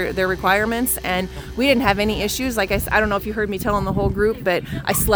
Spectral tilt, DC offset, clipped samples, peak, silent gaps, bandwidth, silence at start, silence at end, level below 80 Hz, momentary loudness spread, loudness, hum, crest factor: -4 dB/octave; under 0.1%; under 0.1%; -2 dBFS; none; over 20 kHz; 0 s; 0 s; -34 dBFS; 5 LU; -20 LUFS; none; 18 dB